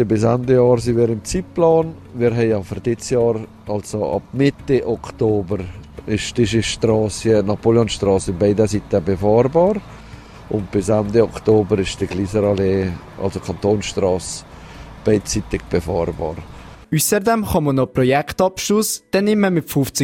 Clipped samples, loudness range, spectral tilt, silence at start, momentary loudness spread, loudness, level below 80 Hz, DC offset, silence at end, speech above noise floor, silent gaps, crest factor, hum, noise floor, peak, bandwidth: under 0.1%; 4 LU; -5.5 dB/octave; 0 s; 10 LU; -18 LUFS; -40 dBFS; under 0.1%; 0 s; 20 dB; none; 16 dB; none; -38 dBFS; -2 dBFS; 16 kHz